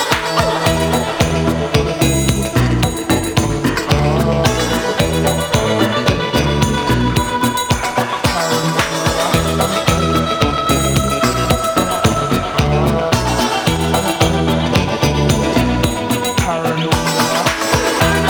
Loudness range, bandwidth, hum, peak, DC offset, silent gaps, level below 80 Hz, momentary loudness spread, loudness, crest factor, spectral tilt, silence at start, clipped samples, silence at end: 1 LU; over 20 kHz; none; 0 dBFS; under 0.1%; none; -28 dBFS; 2 LU; -15 LUFS; 14 dB; -4.5 dB/octave; 0 s; under 0.1%; 0 s